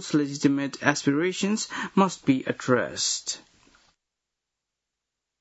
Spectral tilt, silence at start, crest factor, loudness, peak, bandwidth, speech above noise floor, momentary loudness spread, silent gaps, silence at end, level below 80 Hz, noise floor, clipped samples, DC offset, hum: -4 dB/octave; 0 s; 22 dB; -25 LUFS; -4 dBFS; 8 kHz; 60 dB; 5 LU; none; 2 s; -70 dBFS; -85 dBFS; under 0.1%; under 0.1%; none